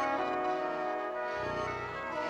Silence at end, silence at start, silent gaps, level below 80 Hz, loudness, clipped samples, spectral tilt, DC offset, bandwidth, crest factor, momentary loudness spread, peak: 0 s; 0 s; none; -60 dBFS; -34 LUFS; under 0.1%; -5.5 dB/octave; under 0.1%; 10 kHz; 14 dB; 4 LU; -20 dBFS